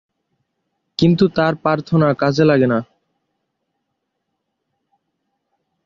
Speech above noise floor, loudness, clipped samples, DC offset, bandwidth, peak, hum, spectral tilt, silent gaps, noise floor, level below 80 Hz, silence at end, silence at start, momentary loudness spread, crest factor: 60 dB; -16 LUFS; under 0.1%; under 0.1%; 7.2 kHz; -2 dBFS; none; -7.5 dB/octave; none; -75 dBFS; -54 dBFS; 3 s; 1 s; 6 LU; 18 dB